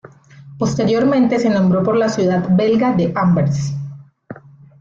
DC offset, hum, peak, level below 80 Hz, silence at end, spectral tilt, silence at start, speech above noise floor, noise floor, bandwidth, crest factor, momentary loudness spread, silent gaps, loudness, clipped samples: under 0.1%; none; -6 dBFS; -50 dBFS; 0.45 s; -7.5 dB/octave; 0.05 s; 26 dB; -40 dBFS; 7.6 kHz; 12 dB; 9 LU; none; -16 LUFS; under 0.1%